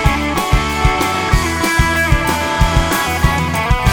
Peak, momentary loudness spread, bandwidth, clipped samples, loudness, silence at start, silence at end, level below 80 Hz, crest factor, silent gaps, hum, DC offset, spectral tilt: 0 dBFS; 2 LU; 19.5 kHz; under 0.1%; -15 LUFS; 0 s; 0 s; -20 dBFS; 14 dB; none; none; under 0.1%; -4.5 dB/octave